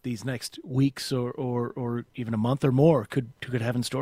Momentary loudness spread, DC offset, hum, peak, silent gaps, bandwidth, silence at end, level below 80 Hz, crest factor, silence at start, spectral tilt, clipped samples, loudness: 11 LU; under 0.1%; none; -8 dBFS; none; 16 kHz; 0 s; -58 dBFS; 18 dB; 0.05 s; -6.5 dB/octave; under 0.1%; -27 LUFS